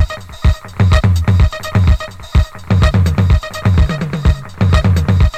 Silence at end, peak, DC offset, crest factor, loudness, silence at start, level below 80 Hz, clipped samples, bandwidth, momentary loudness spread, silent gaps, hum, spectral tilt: 0 s; 0 dBFS; under 0.1%; 12 dB; -14 LUFS; 0 s; -16 dBFS; under 0.1%; 13 kHz; 5 LU; none; none; -7 dB/octave